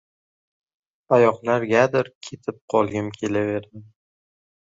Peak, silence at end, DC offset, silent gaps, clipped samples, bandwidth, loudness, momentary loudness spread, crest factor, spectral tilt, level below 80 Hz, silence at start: -2 dBFS; 0.95 s; under 0.1%; 2.15-2.21 s, 2.61-2.68 s; under 0.1%; 7.8 kHz; -21 LUFS; 14 LU; 20 dB; -6.5 dB/octave; -60 dBFS; 1.1 s